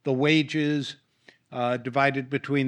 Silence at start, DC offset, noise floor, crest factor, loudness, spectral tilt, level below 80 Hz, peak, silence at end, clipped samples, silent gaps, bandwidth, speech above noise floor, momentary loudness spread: 0.05 s; under 0.1%; -56 dBFS; 18 dB; -25 LUFS; -6 dB/octave; -74 dBFS; -8 dBFS; 0 s; under 0.1%; none; 9.6 kHz; 31 dB; 9 LU